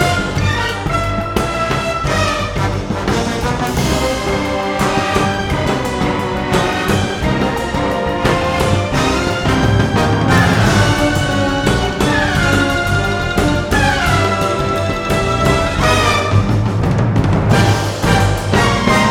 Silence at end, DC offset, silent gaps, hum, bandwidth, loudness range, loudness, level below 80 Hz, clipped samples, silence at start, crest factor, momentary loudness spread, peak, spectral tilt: 0 s; under 0.1%; none; none; 17.5 kHz; 3 LU; -15 LUFS; -26 dBFS; under 0.1%; 0 s; 14 dB; 5 LU; 0 dBFS; -5 dB/octave